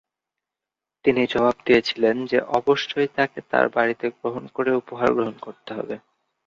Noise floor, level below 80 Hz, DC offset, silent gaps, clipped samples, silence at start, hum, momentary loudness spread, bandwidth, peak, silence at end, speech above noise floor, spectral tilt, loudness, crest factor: -87 dBFS; -60 dBFS; under 0.1%; none; under 0.1%; 1.05 s; none; 12 LU; 7.4 kHz; -4 dBFS; 0.5 s; 66 dB; -5.5 dB/octave; -22 LUFS; 20 dB